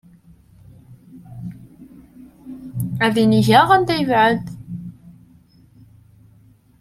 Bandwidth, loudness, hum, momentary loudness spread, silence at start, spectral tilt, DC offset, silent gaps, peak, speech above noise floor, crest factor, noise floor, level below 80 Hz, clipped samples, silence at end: 15 kHz; -16 LUFS; none; 24 LU; 0.9 s; -6 dB/octave; under 0.1%; none; 0 dBFS; 37 dB; 20 dB; -52 dBFS; -52 dBFS; under 0.1%; 1.7 s